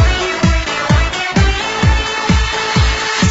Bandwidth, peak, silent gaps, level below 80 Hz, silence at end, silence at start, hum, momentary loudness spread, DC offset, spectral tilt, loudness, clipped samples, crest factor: 8 kHz; -2 dBFS; none; -18 dBFS; 0 s; 0 s; none; 1 LU; under 0.1%; -4.5 dB/octave; -14 LUFS; under 0.1%; 12 dB